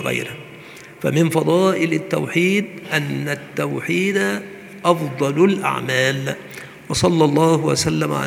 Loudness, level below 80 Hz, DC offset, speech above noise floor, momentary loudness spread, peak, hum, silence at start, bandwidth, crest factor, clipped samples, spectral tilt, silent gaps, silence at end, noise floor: -19 LUFS; -54 dBFS; under 0.1%; 21 dB; 15 LU; 0 dBFS; none; 0 s; 18 kHz; 20 dB; under 0.1%; -5 dB/octave; none; 0 s; -39 dBFS